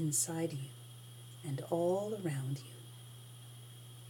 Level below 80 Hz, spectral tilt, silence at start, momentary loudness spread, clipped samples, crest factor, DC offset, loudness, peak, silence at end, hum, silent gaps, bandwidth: -82 dBFS; -5 dB/octave; 0 s; 19 LU; under 0.1%; 20 dB; under 0.1%; -37 LUFS; -20 dBFS; 0 s; 60 Hz at -55 dBFS; none; 19 kHz